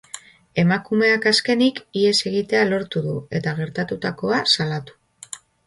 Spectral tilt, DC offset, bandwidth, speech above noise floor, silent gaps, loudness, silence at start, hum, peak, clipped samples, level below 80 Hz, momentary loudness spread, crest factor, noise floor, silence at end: -4.5 dB/octave; under 0.1%; 11.5 kHz; 21 dB; none; -20 LUFS; 0.15 s; none; -4 dBFS; under 0.1%; -60 dBFS; 14 LU; 16 dB; -42 dBFS; 0.3 s